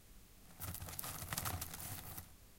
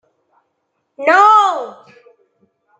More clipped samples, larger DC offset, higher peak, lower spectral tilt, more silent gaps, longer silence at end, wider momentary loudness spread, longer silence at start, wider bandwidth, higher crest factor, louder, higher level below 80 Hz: neither; neither; second, -16 dBFS vs 0 dBFS; first, -3 dB/octave vs -1.5 dB/octave; neither; second, 0 s vs 1.1 s; about the same, 19 LU vs 17 LU; second, 0 s vs 1 s; first, 17 kHz vs 9.2 kHz; first, 32 dB vs 16 dB; second, -45 LUFS vs -12 LUFS; first, -60 dBFS vs -76 dBFS